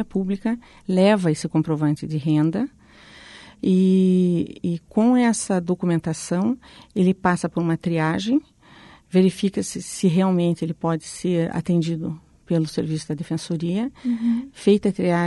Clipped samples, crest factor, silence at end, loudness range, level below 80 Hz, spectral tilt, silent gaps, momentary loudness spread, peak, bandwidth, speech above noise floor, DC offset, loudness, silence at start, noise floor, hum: under 0.1%; 16 dB; 0 s; 4 LU; -56 dBFS; -6.5 dB/octave; none; 10 LU; -6 dBFS; 11.5 kHz; 27 dB; under 0.1%; -22 LUFS; 0 s; -48 dBFS; none